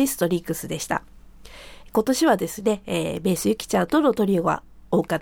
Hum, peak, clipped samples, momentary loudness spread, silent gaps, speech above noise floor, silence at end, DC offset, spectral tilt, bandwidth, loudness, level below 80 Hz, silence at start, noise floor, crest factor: none; -6 dBFS; under 0.1%; 9 LU; none; 21 dB; 0 s; under 0.1%; -5 dB/octave; over 20 kHz; -23 LUFS; -50 dBFS; 0 s; -44 dBFS; 18 dB